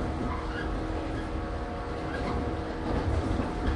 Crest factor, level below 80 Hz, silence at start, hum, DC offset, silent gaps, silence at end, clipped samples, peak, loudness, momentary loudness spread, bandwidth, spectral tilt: 14 dB; -36 dBFS; 0 s; none; under 0.1%; none; 0 s; under 0.1%; -16 dBFS; -32 LUFS; 5 LU; 11 kHz; -7 dB/octave